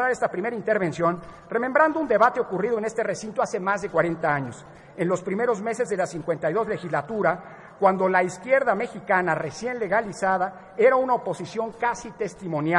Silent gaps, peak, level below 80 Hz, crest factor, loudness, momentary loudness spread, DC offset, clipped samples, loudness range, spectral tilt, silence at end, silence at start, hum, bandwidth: none; -6 dBFS; -60 dBFS; 18 dB; -24 LUFS; 10 LU; under 0.1%; under 0.1%; 3 LU; -6 dB/octave; 0 s; 0 s; none; 11 kHz